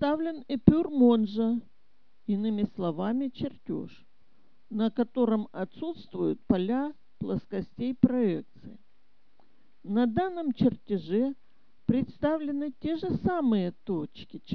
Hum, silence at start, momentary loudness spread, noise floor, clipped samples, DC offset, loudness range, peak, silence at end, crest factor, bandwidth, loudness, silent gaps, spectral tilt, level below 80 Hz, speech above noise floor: none; 0 s; 13 LU; -73 dBFS; under 0.1%; 0.4%; 5 LU; -4 dBFS; 0 s; 24 dB; 5.4 kHz; -29 LUFS; none; -10 dB/octave; -54 dBFS; 45 dB